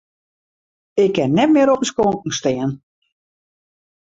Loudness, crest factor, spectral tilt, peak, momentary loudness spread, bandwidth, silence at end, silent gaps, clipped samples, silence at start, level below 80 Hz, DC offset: -17 LUFS; 16 dB; -5.5 dB/octave; -4 dBFS; 11 LU; 8 kHz; 1.35 s; none; under 0.1%; 0.95 s; -56 dBFS; under 0.1%